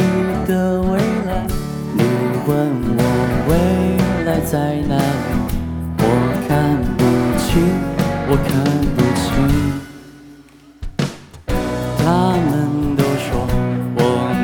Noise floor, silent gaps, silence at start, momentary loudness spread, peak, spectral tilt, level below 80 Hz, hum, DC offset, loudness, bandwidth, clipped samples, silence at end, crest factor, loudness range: -43 dBFS; none; 0 s; 8 LU; -2 dBFS; -7 dB/octave; -28 dBFS; none; under 0.1%; -17 LUFS; over 20 kHz; under 0.1%; 0 s; 14 dB; 4 LU